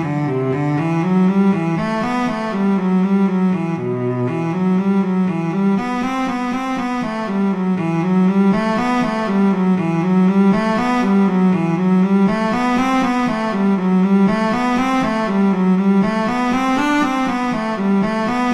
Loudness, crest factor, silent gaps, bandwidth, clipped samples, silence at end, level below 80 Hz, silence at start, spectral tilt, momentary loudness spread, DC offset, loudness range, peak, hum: -17 LUFS; 12 dB; none; 9.6 kHz; under 0.1%; 0 s; -48 dBFS; 0 s; -7.5 dB/octave; 5 LU; under 0.1%; 3 LU; -4 dBFS; none